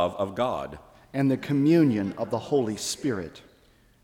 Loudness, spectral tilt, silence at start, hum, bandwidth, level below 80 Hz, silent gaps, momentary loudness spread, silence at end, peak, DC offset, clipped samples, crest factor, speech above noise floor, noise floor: -26 LUFS; -6 dB/octave; 0 s; none; 16.5 kHz; -58 dBFS; none; 13 LU; 0.65 s; -10 dBFS; under 0.1%; under 0.1%; 16 dB; 34 dB; -59 dBFS